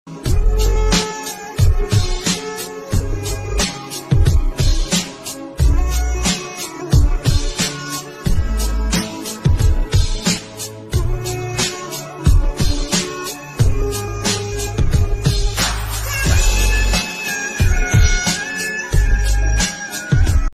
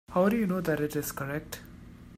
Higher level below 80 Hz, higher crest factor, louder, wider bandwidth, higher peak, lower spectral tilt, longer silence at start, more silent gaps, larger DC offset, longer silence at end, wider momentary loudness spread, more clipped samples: first, -18 dBFS vs -54 dBFS; about the same, 14 dB vs 18 dB; first, -19 LUFS vs -30 LUFS; about the same, 15 kHz vs 16 kHz; first, -2 dBFS vs -12 dBFS; second, -4 dB/octave vs -6 dB/octave; about the same, 0.05 s vs 0.1 s; neither; neither; about the same, 0 s vs 0 s; second, 8 LU vs 19 LU; neither